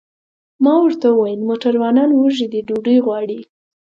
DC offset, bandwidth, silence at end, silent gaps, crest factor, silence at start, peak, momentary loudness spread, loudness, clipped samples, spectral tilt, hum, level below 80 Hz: under 0.1%; 7.4 kHz; 0.55 s; none; 14 dB; 0.6 s; -2 dBFS; 7 LU; -15 LUFS; under 0.1%; -7 dB/octave; none; -68 dBFS